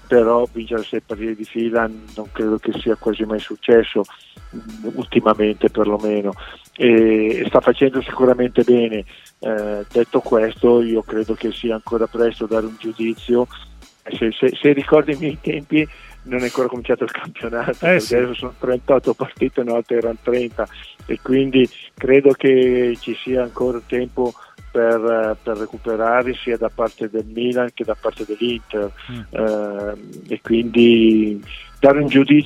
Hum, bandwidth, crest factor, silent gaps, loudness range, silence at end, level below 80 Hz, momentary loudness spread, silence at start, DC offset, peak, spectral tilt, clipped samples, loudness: none; 12.5 kHz; 18 dB; none; 5 LU; 0 s; -44 dBFS; 13 LU; 0.1 s; under 0.1%; 0 dBFS; -6.5 dB/octave; under 0.1%; -18 LUFS